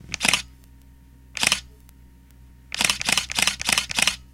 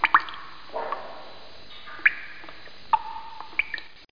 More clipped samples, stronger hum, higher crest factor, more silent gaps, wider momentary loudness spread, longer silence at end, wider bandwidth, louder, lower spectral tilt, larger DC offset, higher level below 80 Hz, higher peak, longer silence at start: neither; neither; about the same, 26 dB vs 24 dB; neither; second, 10 LU vs 21 LU; about the same, 0.1 s vs 0 s; first, 17 kHz vs 5.2 kHz; first, -21 LUFS vs -27 LUFS; second, 0 dB/octave vs -3.5 dB/octave; second, under 0.1% vs 1%; first, -48 dBFS vs -60 dBFS; first, 0 dBFS vs -6 dBFS; about the same, 0.05 s vs 0 s